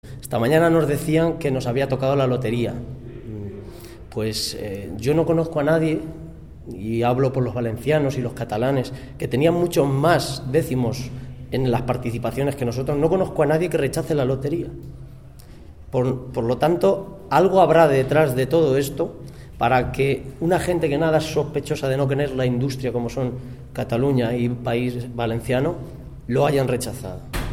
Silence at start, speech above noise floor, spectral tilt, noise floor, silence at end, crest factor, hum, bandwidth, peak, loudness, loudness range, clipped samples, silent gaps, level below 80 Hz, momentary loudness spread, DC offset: 0.05 s; 21 dB; -6.5 dB/octave; -42 dBFS; 0 s; 20 dB; none; 16.5 kHz; -2 dBFS; -21 LUFS; 5 LU; under 0.1%; none; -42 dBFS; 15 LU; 0.4%